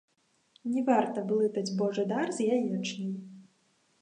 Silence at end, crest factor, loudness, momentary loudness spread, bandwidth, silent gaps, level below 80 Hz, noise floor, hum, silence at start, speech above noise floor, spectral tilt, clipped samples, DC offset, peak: 0.6 s; 20 dB; -30 LUFS; 11 LU; 10.5 kHz; none; -84 dBFS; -70 dBFS; none; 0.65 s; 41 dB; -6 dB/octave; under 0.1%; under 0.1%; -12 dBFS